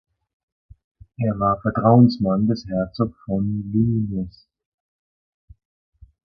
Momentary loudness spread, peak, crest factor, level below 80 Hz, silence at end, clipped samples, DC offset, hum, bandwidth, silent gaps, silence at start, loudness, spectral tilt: 12 LU; -2 dBFS; 22 dB; -48 dBFS; 2.1 s; under 0.1%; under 0.1%; none; 6.2 kHz; none; 1.2 s; -20 LUFS; -10 dB/octave